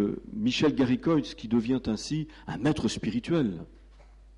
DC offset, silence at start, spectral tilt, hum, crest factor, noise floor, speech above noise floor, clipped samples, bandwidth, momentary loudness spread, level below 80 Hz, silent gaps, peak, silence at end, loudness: under 0.1%; 0 s; -6 dB/octave; none; 14 dB; -52 dBFS; 25 dB; under 0.1%; 11 kHz; 8 LU; -50 dBFS; none; -16 dBFS; 0.35 s; -28 LUFS